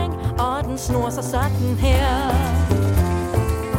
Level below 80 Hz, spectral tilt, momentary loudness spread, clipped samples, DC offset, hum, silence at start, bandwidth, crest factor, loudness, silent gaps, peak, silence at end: -26 dBFS; -6 dB/octave; 4 LU; under 0.1%; under 0.1%; none; 0 s; 17 kHz; 14 dB; -21 LUFS; none; -4 dBFS; 0 s